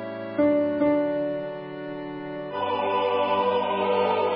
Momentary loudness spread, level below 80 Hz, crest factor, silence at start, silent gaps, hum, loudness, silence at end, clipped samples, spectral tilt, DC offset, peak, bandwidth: 12 LU; -62 dBFS; 14 dB; 0 s; none; none; -25 LUFS; 0 s; under 0.1%; -10 dB/octave; under 0.1%; -12 dBFS; 5.2 kHz